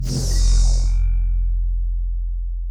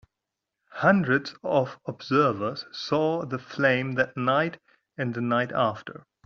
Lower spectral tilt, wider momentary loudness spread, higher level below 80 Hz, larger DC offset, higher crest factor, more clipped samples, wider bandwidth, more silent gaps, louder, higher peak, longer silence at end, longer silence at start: about the same, -5 dB/octave vs -4.5 dB/octave; second, 9 LU vs 12 LU; first, -18 dBFS vs -66 dBFS; neither; second, 10 dB vs 20 dB; neither; first, 10.5 kHz vs 7.2 kHz; neither; about the same, -23 LUFS vs -25 LUFS; about the same, -8 dBFS vs -6 dBFS; second, 0 s vs 0.35 s; second, 0 s vs 0.75 s